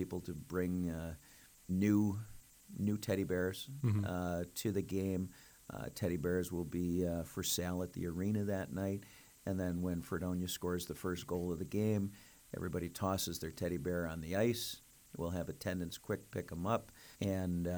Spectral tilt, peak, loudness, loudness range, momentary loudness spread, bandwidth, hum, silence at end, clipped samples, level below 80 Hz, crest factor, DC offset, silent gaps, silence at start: -5.5 dB/octave; -22 dBFS; -39 LUFS; 2 LU; 10 LU; over 20 kHz; none; 0 s; under 0.1%; -60 dBFS; 18 dB; under 0.1%; none; 0 s